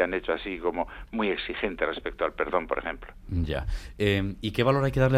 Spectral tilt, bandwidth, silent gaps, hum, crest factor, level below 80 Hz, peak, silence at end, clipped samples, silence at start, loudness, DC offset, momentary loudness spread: -7 dB/octave; 14.5 kHz; none; none; 18 dB; -40 dBFS; -8 dBFS; 0 s; under 0.1%; 0 s; -29 LUFS; under 0.1%; 9 LU